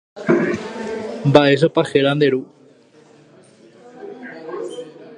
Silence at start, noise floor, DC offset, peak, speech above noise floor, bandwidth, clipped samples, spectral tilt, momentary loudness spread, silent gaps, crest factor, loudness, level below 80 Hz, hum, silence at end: 0.15 s; -49 dBFS; under 0.1%; 0 dBFS; 33 dB; 10.5 kHz; under 0.1%; -6.5 dB/octave; 21 LU; none; 20 dB; -18 LUFS; -60 dBFS; none; 0 s